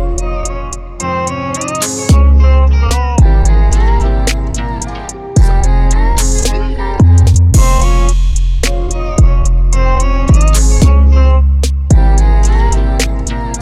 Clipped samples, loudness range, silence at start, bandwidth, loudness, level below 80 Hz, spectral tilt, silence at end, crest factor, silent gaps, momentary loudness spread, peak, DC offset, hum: under 0.1%; 3 LU; 0 s; 13.5 kHz; -12 LUFS; -10 dBFS; -5.5 dB/octave; 0 s; 8 dB; none; 10 LU; 0 dBFS; under 0.1%; none